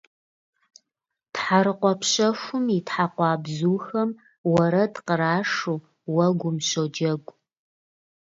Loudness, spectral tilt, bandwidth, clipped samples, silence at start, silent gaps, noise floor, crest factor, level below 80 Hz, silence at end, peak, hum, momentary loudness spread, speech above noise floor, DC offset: -24 LUFS; -5 dB/octave; 7.8 kHz; under 0.1%; 1.35 s; 4.38-4.44 s; -85 dBFS; 20 dB; -66 dBFS; 1.15 s; -6 dBFS; none; 8 LU; 62 dB; under 0.1%